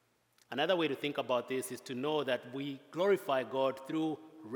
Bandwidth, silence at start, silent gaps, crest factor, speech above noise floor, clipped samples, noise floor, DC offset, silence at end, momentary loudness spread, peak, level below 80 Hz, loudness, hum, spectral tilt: 18 kHz; 0.5 s; none; 18 dB; 37 dB; under 0.1%; -71 dBFS; under 0.1%; 0 s; 10 LU; -18 dBFS; under -90 dBFS; -35 LUFS; none; -4.5 dB/octave